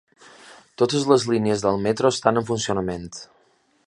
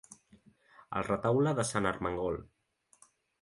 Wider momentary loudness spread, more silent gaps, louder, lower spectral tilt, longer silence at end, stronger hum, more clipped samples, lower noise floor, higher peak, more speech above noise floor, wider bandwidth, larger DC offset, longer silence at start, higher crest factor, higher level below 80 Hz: first, 12 LU vs 9 LU; neither; first, -21 LUFS vs -32 LUFS; about the same, -5 dB/octave vs -5.5 dB/octave; second, 0.6 s vs 0.95 s; neither; neither; second, -62 dBFS vs -66 dBFS; first, -2 dBFS vs -12 dBFS; first, 41 dB vs 35 dB; about the same, 11.5 kHz vs 11.5 kHz; neither; first, 0.45 s vs 0.1 s; about the same, 22 dB vs 22 dB; about the same, -54 dBFS vs -58 dBFS